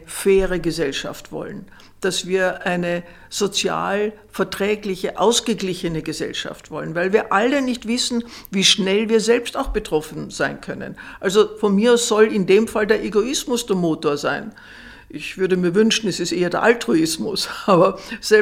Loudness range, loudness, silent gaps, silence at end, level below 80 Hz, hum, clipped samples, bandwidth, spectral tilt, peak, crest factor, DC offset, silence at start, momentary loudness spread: 4 LU; -19 LUFS; none; 0 s; -44 dBFS; none; under 0.1%; 16.5 kHz; -4 dB/octave; 0 dBFS; 20 dB; under 0.1%; 0 s; 14 LU